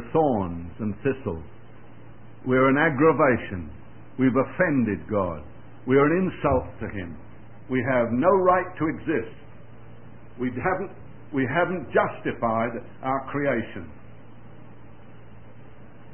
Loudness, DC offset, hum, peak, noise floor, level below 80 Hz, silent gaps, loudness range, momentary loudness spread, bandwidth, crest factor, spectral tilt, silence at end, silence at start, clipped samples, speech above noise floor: -24 LUFS; 0.9%; none; -6 dBFS; -48 dBFS; -50 dBFS; none; 6 LU; 17 LU; 3.3 kHz; 20 dB; -11.5 dB/octave; 0.25 s; 0 s; under 0.1%; 24 dB